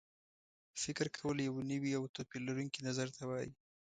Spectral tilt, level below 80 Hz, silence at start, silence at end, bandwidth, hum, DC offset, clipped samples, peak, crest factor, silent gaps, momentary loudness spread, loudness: -4.5 dB/octave; -74 dBFS; 0.75 s; 0.25 s; 9.4 kHz; none; under 0.1%; under 0.1%; -22 dBFS; 20 dB; 2.09-2.14 s; 6 LU; -41 LUFS